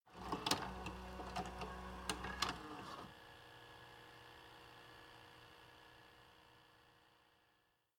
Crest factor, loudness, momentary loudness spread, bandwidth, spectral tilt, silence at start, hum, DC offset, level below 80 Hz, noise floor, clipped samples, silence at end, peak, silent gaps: 32 dB; -46 LUFS; 22 LU; 18 kHz; -3 dB/octave; 0.05 s; none; under 0.1%; -62 dBFS; -79 dBFS; under 0.1%; 0.7 s; -18 dBFS; none